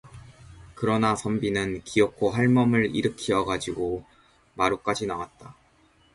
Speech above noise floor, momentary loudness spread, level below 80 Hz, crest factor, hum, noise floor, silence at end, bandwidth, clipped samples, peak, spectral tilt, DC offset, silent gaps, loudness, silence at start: 36 dB; 10 LU; -52 dBFS; 18 dB; none; -61 dBFS; 0.65 s; 11.5 kHz; under 0.1%; -8 dBFS; -6 dB/octave; under 0.1%; none; -25 LUFS; 0.05 s